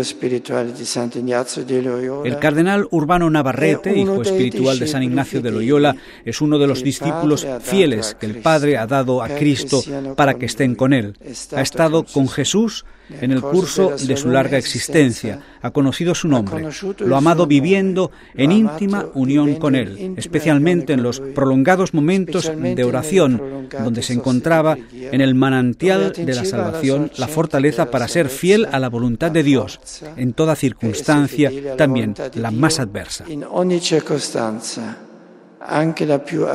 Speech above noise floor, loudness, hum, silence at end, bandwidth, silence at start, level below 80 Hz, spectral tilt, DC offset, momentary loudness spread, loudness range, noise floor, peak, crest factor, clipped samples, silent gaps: 26 dB; -17 LUFS; none; 0 s; 15.5 kHz; 0 s; -48 dBFS; -5.5 dB/octave; under 0.1%; 9 LU; 2 LU; -43 dBFS; 0 dBFS; 16 dB; under 0.1%; none